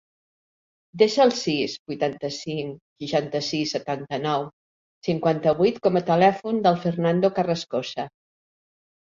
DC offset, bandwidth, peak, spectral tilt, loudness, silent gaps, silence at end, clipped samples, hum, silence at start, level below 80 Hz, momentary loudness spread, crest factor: under 0.1%; 7.8 kHz; -4 dBFS; -5.5 dB/octave; -23 LUFS; 1.79-1.86 s, 2.81-2.96 s, 4.53-5.02 s; 1.1 s; under 0.1%; none; 0.95 s; -64 dBFS; 12 LU; 20 dB